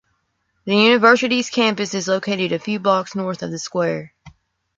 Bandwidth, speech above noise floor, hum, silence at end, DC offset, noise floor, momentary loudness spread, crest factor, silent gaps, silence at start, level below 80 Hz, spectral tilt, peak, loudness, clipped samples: 7.8 kHz; 51 dB; none; 0.5 s; under 0.1%; -69 dBFS; 13 LU; 18 dB; none; 0.65 s; -62 dBFS; -4 dB/octave; -2 dBFS; -18 LUFS; under 0.1%